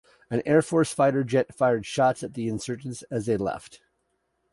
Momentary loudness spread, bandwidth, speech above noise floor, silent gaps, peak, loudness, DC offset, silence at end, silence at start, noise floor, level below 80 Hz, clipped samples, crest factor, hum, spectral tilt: 10 LU; 11.5 kHz; 49 dB; none; -6 dBFS; -25 LUFS; under 0.1%; 0.75 s; 0.3 s; -74 dBFS; -60 dBFS; under 0.1%; 18 dB; none; -6 dB/octave